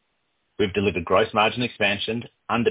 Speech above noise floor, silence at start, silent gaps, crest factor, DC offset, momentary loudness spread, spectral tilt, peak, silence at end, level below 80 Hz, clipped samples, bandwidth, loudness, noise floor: 50 dB; 0.6 s; none; 18 dB; under 0.1%; 6 LU; -9.5 dB/octave; -6 dBFS; 0 s; -50 dBFS; under 0.1%; 4 kHz; -23 LUFS; -73 dBFS